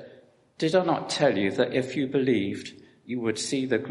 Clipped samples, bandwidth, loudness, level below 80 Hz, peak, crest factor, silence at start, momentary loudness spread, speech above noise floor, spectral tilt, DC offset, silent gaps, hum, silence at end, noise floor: under 0.1%; 11.5 kHz; -26 LUFS; -68 dBFS; -8 dBFS; 18 dB; 0 s; 9 LU; 29 dB; -5 dB/octave; under 0.1%; none; none; 0 s; -55 dBFS